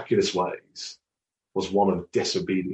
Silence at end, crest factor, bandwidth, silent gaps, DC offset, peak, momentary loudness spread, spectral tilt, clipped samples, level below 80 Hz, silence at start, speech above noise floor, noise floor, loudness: 0 s; 18 dB; 8.6 kHz; none; under 0.1%; -10 dBFS; 14 LU; -5 dB/octave; under 0.1%; -60 dBFS; 0 s; 63 dB; -88 dBFS; -26 LUFS